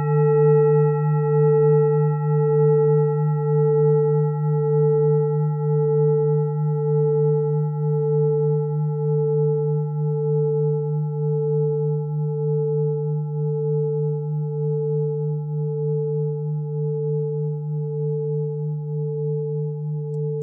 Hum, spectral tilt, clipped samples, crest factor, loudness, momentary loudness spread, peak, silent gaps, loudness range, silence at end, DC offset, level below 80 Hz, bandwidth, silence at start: none; -16 dB/octave; under 0.1%; 12 dB; -21 LUFS; 8 LU; -8 dBFS; none; 6 LU; 0 s; under 0.1%; under -90 dBFS; 2.7 kHz; 0 s